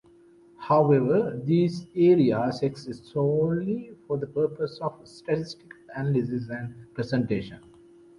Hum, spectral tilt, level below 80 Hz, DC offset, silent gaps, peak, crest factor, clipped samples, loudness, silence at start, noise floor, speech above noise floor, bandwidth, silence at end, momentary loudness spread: none; -8.5 dB/octave; -60 dBFS; under 0.1%; none; -8 dBFS; 18 dB; under 0.1%; -26 LUFS; 0.6 s; -55 dBFS; 30 dB; 11 kHz; 0.6 s; 17 LU